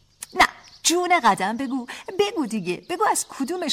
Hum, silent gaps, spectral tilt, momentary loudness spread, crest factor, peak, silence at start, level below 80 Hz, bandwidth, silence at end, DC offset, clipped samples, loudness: none; none; -2.5 dB/octave; 10 LU; 18 dB; -4 dBFS; 0.2 s; -56 dBFS; 16.5 kHz; 0 s; under 0.1%; under 0.1%; -22 LUFS